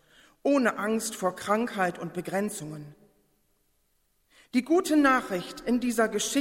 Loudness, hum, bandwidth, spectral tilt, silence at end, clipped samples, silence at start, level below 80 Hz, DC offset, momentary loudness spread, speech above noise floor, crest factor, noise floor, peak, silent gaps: -27 LUFS; none; 16 kHz; -4 dB/octave; 0 s; under 0.1%; 0.45 s; -62 dBFS; under 0.1%; 11 LU; 45 dB; 18 dB; -72 dBFS; -10 dBFS; none